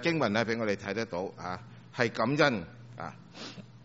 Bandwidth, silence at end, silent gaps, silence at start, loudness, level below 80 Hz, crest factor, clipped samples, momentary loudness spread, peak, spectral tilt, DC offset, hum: 8 kHz; 0.05 s; none; 0 s; -30 LUFS; -66 dBFS; 22 dB; under 0.1%; 18 LU; -10 dBFS; -4 dB/octave; under 0.1%; none